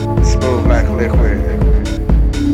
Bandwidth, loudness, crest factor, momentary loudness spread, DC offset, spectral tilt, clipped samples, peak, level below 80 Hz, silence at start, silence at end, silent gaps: 9.2 kHz; -14 LUFS; 10 dB; 2 LU; under 0.1%; -7 dB/octave; under 0.1%; -2 dBFS; -14 dBFS; 0 s; 0 s; none